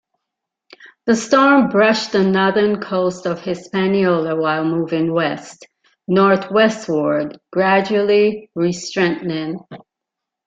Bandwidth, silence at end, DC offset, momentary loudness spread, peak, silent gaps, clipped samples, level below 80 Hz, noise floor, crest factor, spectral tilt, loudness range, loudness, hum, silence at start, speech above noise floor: 9.2 kHz; 0.7 s; under 0.1%; 10 LU; -2 dBFS; none; under 0.1%; -60 dBFS; -82 dBFS; 16 dB; -5.5 dB/octave; 3 LU; -17 LUFS; none; 1.05 s; 66 dB